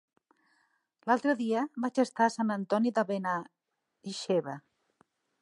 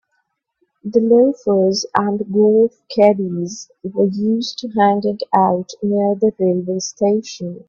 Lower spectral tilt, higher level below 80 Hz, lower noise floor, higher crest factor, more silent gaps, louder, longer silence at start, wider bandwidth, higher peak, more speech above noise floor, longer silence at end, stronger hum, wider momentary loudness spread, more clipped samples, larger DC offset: about the same, -5.5 dB/octave vs -6 dB/octave; second, -86 dBFS vs -62 dBFS; about the same, -73 dBFS vs -70 dBFS; about the same, 20 dB vs 16 dB; neither; second, -30 LUFS vs -17 LUFS; first, 1.05 s vs 0.85 s; first, 11.5 kHz vs 7.4 kHz; second, -12 dBFS vs 0 dBFS; second, 44 dB vs 53 dB; first, 0.8 s vs 0.1 s; neither; first, 13 LU vs 9 LU; neither; neither